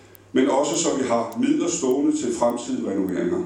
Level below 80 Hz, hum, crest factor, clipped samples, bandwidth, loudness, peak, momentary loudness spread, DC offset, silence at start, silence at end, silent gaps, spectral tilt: -62 dBFS; none; 16 dB; under 0.1%; 18 kHz; -22 LUFS; -6 dBFS; 4 LU; under 0.1%; 0.35 s; 0 s; none; -4 dB/octave